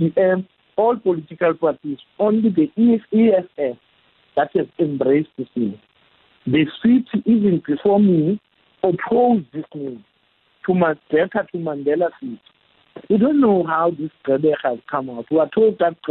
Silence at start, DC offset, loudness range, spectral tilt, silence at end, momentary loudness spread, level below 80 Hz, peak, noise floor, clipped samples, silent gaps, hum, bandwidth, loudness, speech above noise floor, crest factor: 0 s; under 0.1%; 4 LU; -11.5 dB/octave; 0 s; 12 LU; -60 dBFS; -6 dBFS; -62 dBFS; under 0.1%; none; none; 4.1 kHz; -19 LUFS; 44 dB; 12 dB